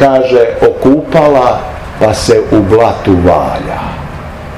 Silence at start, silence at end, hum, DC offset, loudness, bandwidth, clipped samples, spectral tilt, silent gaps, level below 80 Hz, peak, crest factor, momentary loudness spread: 0 s; 0 s; none; 0.5%; -9 LUFS; 14 kHz; 4%; -6.5 dB/octave; none; -28 dBFS; 0 dBFS; 8 dB; 13 LU